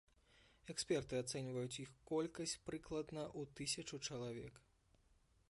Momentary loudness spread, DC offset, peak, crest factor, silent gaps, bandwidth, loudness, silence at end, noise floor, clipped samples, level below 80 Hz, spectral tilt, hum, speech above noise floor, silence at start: 8 LU; under 0.1%; -28 dBFS; 18 dB; none; 11.5 kHz; -45 LUFS; 0.9 s; -75 dBFS; under 0.1%; -70 dBFS; -4 dB/octave; none; 29 dB; 0.35 s